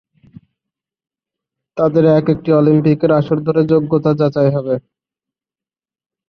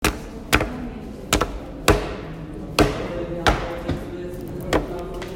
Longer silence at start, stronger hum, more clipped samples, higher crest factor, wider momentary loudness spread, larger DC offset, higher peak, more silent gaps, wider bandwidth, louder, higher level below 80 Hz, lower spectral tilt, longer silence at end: first, 1.75 s vs 0 s; neither; neither; second, 14 dB vs 24 dB; second, 7 LU vs 13 LU; neither; about the same, -2 dBFS vs 0 dBFS; neither; second, 6 kHz vs 16.5 kHz; first, -14 LUFS vs -24 LUFS; second, -54 dBFS vs -32 dBFS; first, -10.5 dB/octave vs -4.5 dB/octave; first, 1.5 s vs 0 s